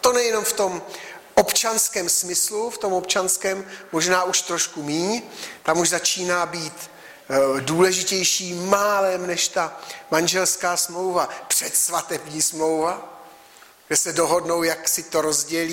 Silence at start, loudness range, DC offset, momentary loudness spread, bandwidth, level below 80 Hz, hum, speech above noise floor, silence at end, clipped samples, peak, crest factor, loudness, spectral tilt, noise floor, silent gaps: 0.05 s; 2 LU; under 0.1%; 10 LU; 16.5 kHz; -62 dBFS; none; 27 dB; 0 s; under 0.1%; -4 dBFS; 18 dB; -21 LUFS; -2 dB/octave; -49 dBFS; none